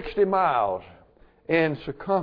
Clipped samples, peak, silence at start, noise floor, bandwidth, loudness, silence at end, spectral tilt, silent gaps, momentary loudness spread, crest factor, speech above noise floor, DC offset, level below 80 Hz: under 0.1%; -10 dBFS; 0 s; -55 dBFS; 5.2 kHz; -24 LUFS; 0 s; -9 dB/octave; none; 10 LU; 16 dB; 32 dB; under 0.1%; -52 dBFS